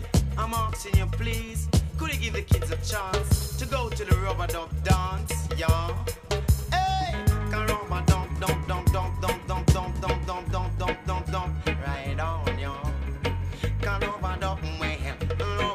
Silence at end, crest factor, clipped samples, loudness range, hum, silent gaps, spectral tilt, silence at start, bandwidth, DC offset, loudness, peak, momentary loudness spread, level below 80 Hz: 0 s; 20 dB; under 0.1%; 3 LU; none; none; -5.5 dB/octave; 0 s; 15.5 kHz; under 0.1%; -28 LUFS; -6 dBFS; 5 LU; -30 dBFS